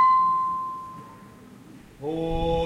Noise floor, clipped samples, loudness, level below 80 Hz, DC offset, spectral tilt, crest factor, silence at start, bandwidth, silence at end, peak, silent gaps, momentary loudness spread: -47 dBFS; under 0.1%; -25 LUFS; -40 dBFS; under 0.1%; -7 dB/octave; 14 dB; 0 s; 11.5 kHz; 0 s; -12 dBFS; none; 27 LU